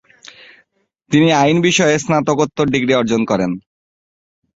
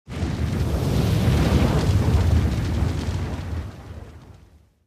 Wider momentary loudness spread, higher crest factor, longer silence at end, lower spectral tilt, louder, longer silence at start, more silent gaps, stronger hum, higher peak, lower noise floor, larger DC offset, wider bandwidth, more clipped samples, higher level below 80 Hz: second, 6 LU vs 14 LU; about the same, 16 dB vs 16 dB; first, 1 s vs 0.5 s; second, -5 dB/octave vs -7 dB/octave; first, -15 LUFS vs -22 LUFS; first, 1.1 s vs 0.1 s; neither; neither; first, -2 dBFS vs -6 dBFS; first, -61 dBFS vs -52 dBFS; neither; second, 8 kHz vs 15.5 kHz; neither; second, -52 dBFS vs -28 dBFS